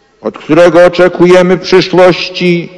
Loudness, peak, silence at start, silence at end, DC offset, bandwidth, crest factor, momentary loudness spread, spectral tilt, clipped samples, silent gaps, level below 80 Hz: -6 LUFS; 0 dBFS; 0.25 s; 0.1 s; under 0.1%; 11 kHz; 6 dB; 6 LU; -6 dB/octave; 10%; none; -40 dBFS